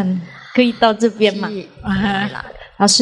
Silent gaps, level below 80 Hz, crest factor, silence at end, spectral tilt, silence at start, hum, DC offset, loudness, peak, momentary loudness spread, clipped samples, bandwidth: none; -44 dBFS; 16 dB; 0 s; -3.5 dB/octave; 0 s; none; under 0.1%; -17 LUFS; 0 dBFS; 12 LU; under 0.1%; 12 kHz